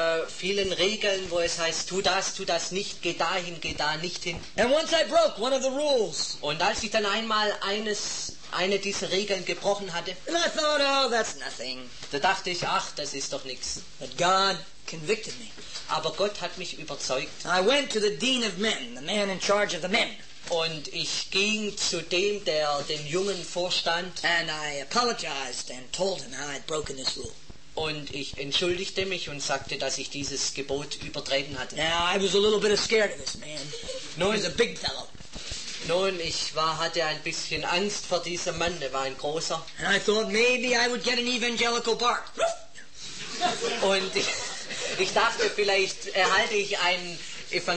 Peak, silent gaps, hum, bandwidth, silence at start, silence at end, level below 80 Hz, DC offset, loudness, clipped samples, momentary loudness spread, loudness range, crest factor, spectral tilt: -10 dBFS; none; none; 8.8 kHz; 0 s; 0 s; -56 dBFS; 0.8%; -27 LUFS; under 0.1%; 11 LU; 4 LU; 18 dB; -2 dB/octave